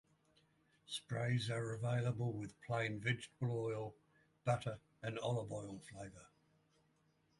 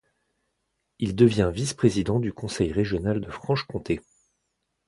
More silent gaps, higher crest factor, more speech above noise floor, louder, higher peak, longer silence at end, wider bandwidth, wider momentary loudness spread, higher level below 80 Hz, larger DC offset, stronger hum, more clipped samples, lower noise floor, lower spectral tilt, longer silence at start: neither; about the same, 20 dB vs 22 dB; second, 36 dB vs 53 dB; second, -42 LUFS vs -25 LUFS; second, -24 dBFS vs -4 dBFS; first, 1.15 s vs 0.9 s; about the same, 11.5 kHz vs 11.5 kHz; about the same, 12 LU vs 10 LU; second, -72 dBFS vs -46 dBFS; neither; neither; neither; about the same, -77 dBFS vs -78 dBFS; about the same, -6 dB/octave vs -6.5 dB/octave; about the same, 0.9 s vs 1 s